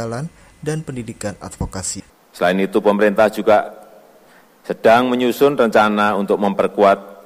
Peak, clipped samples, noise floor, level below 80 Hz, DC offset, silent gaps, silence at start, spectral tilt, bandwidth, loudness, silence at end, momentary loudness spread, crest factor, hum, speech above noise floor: -2 dBFS; under 0.1%; -49 dBFS; -46 dBFS; under 0.1%; none; 0 s; -5 dB/octave; 16 kHz; -16 LUFS; 0.1 s; 15 LU; 14 dB; none; 32 dB